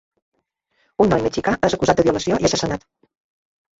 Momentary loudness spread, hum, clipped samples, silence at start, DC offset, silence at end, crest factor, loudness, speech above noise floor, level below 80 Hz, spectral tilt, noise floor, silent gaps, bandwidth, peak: 9 LU; none; under 0.1%; 1 s; under 0.1%; 1 s; 18 dB; -19 LUFS; 50 dB; -44 dBFS; -5 dB/octave; -68 dBFS; none; 8 kHz; -2 dBFS